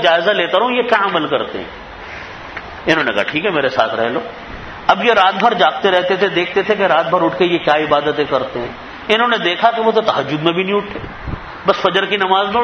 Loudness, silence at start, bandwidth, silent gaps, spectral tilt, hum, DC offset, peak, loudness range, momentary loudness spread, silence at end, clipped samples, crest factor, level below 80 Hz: -15 LUFS; 0 s; 8.2 kHz; none; -5 dB/octave; none; under 0.1%; 0 dBFS; 4 LU; 15 LU; 0 s; under 0.1%; 16 dB; -44 dBFS